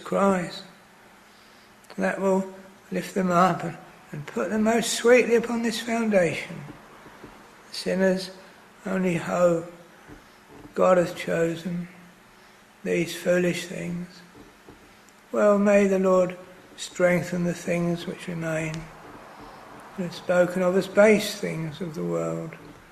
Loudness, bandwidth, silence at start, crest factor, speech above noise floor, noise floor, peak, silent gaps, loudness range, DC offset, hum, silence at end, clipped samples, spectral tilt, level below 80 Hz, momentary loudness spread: -24 LUFS; 13.5 kHz; 0 s; 20 dB; 29 dB; -53 dBFS; -4 dBFS; none; 5 LU; under 0.1%; none; 0.2 s; under 0.1%; -5.5 dB/octave; -60 dBFS; 22 LU